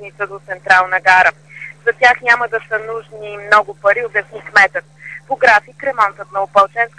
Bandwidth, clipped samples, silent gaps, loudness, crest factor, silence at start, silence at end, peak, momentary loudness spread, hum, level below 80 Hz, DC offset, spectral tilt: 10.5 kHz; under 0.1%; none; -13 LUFS; 16 dB; 0 s; 0.1 s; 0 dBFS; 16 LU; none; -56 dBFS; 0.2%; -2.5 dB/octave